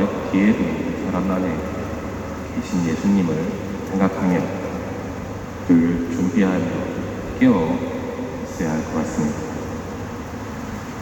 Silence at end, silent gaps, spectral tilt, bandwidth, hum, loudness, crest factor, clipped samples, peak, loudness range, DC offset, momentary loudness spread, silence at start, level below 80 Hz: 0 s; none; -7 dB/octave; 19.5 kHz; none; -22 LUFS; 18 dB; under 0.1%; -4 dBFS; 3 LU; under 0.1%; 12 LU; 0 s; -40 dBFS